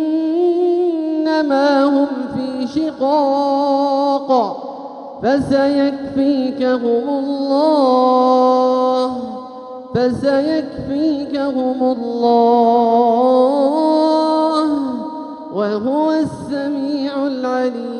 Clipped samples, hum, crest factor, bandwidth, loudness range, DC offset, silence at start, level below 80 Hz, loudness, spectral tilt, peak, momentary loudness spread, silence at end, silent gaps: under 0.1%; none; 14 dB; 10.5 kHz; 4 LU; under 0.1%; 0 s; -54 dBFS; -16 LUFS; -6.5 dB/octave; -2 dBFS; 10 LU; 0 s; none